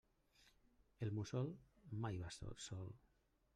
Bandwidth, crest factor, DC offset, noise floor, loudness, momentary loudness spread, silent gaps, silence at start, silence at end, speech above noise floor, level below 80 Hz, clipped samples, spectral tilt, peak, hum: 10.5 kHz; 18 dB; under 0.1%; -75 dBFS; -49 LUFS; 11 LU; none; 0.4 s; 0.6 s; 28 dB; -68 dBFS; under 0.1%; -6 dB/octave; -30 dBFS; none